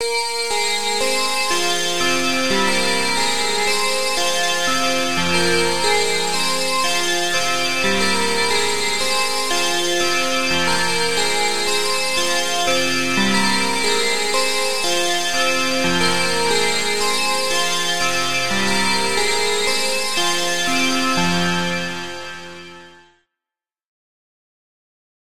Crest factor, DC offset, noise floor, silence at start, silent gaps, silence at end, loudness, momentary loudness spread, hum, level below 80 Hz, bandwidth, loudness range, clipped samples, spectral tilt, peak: 16 dB; 5%; -89 dBFS; 0 s; none; 1.35 s; -17 LUFS; 2 LU; none; -50 dBFS; 16.5 kHz; 2 LU; under 0.1%; -1.5 dB/octave; -4 dBFS